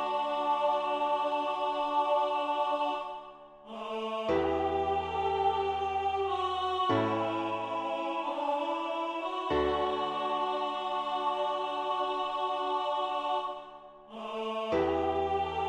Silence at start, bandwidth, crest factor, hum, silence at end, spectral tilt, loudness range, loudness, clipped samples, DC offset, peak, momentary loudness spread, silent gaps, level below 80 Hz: 0 s; 10.5 kHz; 14 dB; none; 0 s; -5.5 dB/octave; 2 LU; -31 LUFS; under 0.1%; under 0.1%; -16 dBFS; 8 LU; none; -58 dBFS